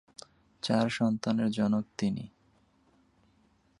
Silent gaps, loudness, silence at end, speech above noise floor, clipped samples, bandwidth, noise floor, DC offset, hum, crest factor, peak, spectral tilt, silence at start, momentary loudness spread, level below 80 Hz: none; -30 LUFS; 1.55 s; 38 dB; under 0.1%; 11 kHz; -67 dBFS; under 0.1%; none; 20 dB; -12 dBFS; -6 dB/octave; 0.65 s; 20 LU; -66 dBFS